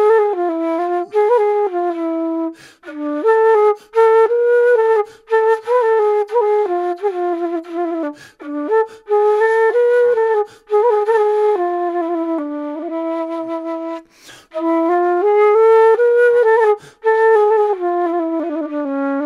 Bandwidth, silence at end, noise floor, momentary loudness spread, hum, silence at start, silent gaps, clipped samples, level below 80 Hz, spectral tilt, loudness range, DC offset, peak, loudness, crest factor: 10.5 kHz; 0 s; -43 dBFS; 12 LU; none; 0 s; none; under 0.1%; -68 dBFS; -4.5 dB/octave; 6 LU; under 0.1%; -4 dBFS; -16 LUFS; 12 dB